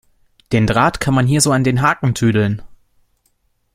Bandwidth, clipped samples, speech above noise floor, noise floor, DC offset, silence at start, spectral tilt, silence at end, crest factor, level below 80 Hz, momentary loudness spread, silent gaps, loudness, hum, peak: 16 kHz; under 0.1%; 49 dB; -63 dBFS; under 0.1%; 0.5 s; -5 dB/octave; 1 s; 16 dB; -40 dBFS; 6 LU; none; -15 LUFS; none; 0 dBFS